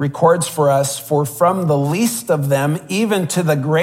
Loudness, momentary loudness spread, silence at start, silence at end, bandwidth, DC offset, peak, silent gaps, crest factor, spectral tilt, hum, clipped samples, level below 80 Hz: -17 LUFS; 4 LU; 0 s; 0 s; 16.5 kHz; under 0.1%; -2 dBFS; none; 14 dB; -5.5 dB/octave; none; under 0.1%; -60 dBFS